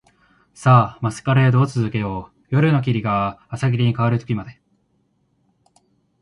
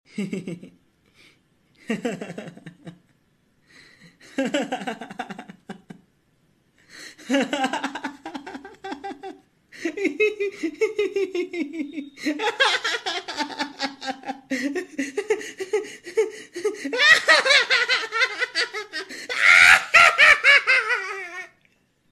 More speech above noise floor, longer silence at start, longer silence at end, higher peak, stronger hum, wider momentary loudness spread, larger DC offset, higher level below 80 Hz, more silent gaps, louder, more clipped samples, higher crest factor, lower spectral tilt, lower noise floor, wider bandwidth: first, 47 dB vs 38 dB; first, 0.6 s vs 0.15 s; first, 1.7 s vs 0.65 s; about the same, 0 dBFS vs -2 dBFS; neither; second, 12 LU vs 23 LU; neither; first, -50 dBFS vs -64 dBFS; neither; about the same, -19 LUFS vs -20 LUFS; neither; about the same, 20 dB vs 22 dB; first, -7.5 dB/octave vs -2 dB/octave; about the same, -65 dBFS vs -64 dBFS; second, 11 kHz vs 13 kHz